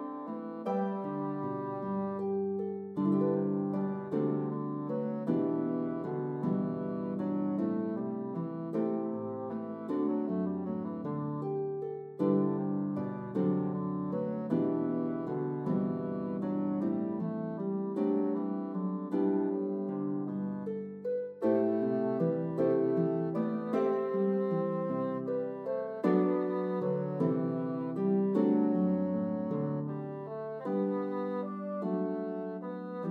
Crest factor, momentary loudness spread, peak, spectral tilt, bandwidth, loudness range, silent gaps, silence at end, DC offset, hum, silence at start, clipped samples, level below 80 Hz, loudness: 18 dB; 7 LU; -14 dBFS; -11 dB/octave; 4.4 kHz; 4 LU; none; 0 s; under 0.1%; none; 0 s; under 0.1%; -82 dBFS; -33 LUFS